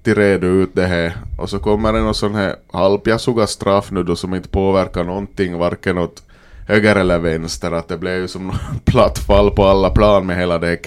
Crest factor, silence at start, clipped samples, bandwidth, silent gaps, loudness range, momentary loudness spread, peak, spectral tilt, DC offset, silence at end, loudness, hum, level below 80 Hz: 16 dB; 0.05 s; under 0.1%; 14.5 kHz; none; 3 LU; 9 LU; 0 dBFS; -6 dB/octave; under 0.1%; 0 s; -16 LUFS; none; -28 dBFS